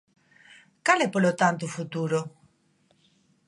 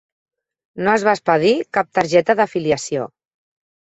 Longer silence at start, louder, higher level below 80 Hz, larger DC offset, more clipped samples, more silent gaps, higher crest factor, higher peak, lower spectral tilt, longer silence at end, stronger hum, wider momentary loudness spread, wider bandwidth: about the same, 0.85 s vs 0.75 s; second, -25 LUFS vs -18 LUFS; second, -76 dBFS vs -58 dBFS; neither; neither; neither; first, 24 dB vs 18 dB; about the same, -4 dBFS vs -2 dBFS; about the same, -5 dB/octave vs -5 dB/octave; first, 1.2 s vs 0.9 s; neither; about the same, 10 LU vs 8 LU; first, 11.5 kHz vs 8.2 kHz